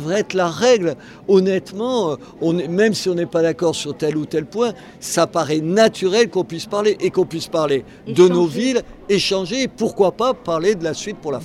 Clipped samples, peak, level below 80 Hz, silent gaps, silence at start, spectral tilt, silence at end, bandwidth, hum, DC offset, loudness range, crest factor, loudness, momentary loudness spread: under 0.1%; 0 dBFS; -54 dBFS; none; 0 s; -5 dB/octave; 0 s; 13.5 kHz; none; under 0.1%; 2 LU; 18 dB; -19 LUFS; 8 LU